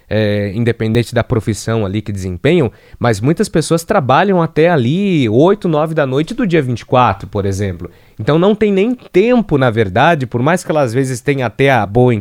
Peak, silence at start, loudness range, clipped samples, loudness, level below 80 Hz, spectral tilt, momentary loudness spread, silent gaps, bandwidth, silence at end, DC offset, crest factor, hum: 0 dBFS; 0.1 s; 3 LU; under 0.1%; -14 LUFS; -40 dBFS; -6.5 dB/octave; 7 LU; none; 16 kHz; 0 s; under 0.1%; 14 dB; none